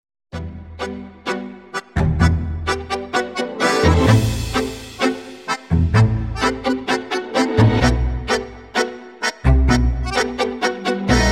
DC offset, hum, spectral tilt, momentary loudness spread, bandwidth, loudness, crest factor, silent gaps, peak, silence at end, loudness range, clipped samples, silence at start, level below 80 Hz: 0.1%; none; -5.5 dB/octave; 14 LU; 15.5 kHz; -19 LUFS; 18 dB; none; -2 dBFS; 0 s; 3 LU; under 0.1%; 0.35 s; -26 dBFS